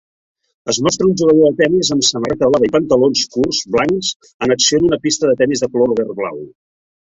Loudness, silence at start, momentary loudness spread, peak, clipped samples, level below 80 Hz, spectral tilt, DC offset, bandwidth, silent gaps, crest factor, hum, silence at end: -14 LUFS; 0.65 s; 9 LU; 0 dBFS; under 0.1%; -48 dBFS; -3.5 dB/octave; under 0.1%; 8.2 kHz; 4.16-4.20 s, 4.34-4.40 s; 16 dB; none; 0.65 s